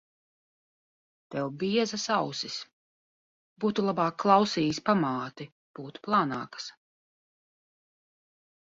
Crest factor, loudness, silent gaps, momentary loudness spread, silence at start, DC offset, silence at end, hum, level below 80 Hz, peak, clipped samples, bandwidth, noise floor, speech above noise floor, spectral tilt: 24 dB; -28 LUFS; 2.73-3.56 s, 5.52-5.74 s; 19 LU; 1.3 s; under 0.1%; 1.95 s; none; -70 dBFS; -6 dBFS; under 0.1%; 7.8 kHz; under -90 dBFS; over 62 dB; -5 dB/octave